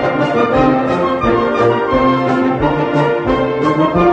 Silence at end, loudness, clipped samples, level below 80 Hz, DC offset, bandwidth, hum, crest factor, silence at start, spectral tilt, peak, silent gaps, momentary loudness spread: 0 s; -14 LUFS; under 0.1%; -34 dBFS; under 0.1%; 8.6 kHz; none; 12 dB; 0 s; -7.5 dB/octave; 0 dBFS; none; 3 LU